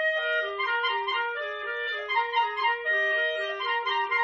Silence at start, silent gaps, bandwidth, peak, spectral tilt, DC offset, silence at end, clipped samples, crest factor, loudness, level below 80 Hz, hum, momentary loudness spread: 0 s; none; 7.4 kHz; -12 dBFS; 4.5 dB/octave; under 0.1%; 0 s; under 0.1%; 14 dB; -27 LUFS; -70 dBFS; none; 6 LU